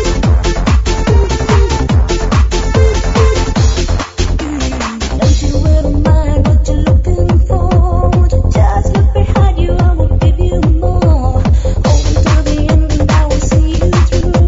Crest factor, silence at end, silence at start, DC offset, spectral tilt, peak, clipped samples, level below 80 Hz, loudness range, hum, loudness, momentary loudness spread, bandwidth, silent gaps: 10 dB; 0 s; 0 s; under 0.1%; -6.5 dB/octave; 0 dBFS; under 0.1%; -12 dBFS; 2 LU; none; -12 LUFS; 2 LU; 7.8 kHz; none